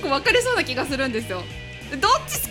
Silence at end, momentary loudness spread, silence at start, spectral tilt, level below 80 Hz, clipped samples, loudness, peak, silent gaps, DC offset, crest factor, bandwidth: 0 s; 14 LU; 0 s; -3 dB/octave; -42 dBFS; under 0.1%; -21 LUFS; -4 dBFS; none; under 0.1%; 18 dB; 17.5 kHz